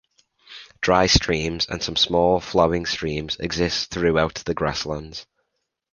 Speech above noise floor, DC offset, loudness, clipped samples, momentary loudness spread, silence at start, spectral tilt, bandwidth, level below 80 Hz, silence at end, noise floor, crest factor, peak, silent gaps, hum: 55 dB; under 0.1%; -21 LUFS; under 0.1%; 12 LU; 0.5 s; -4 dB/octave; 10 kHz; -40 dBFS; 0.7 s; -76 dBFS; 22 dB; -2 dBFS; none; none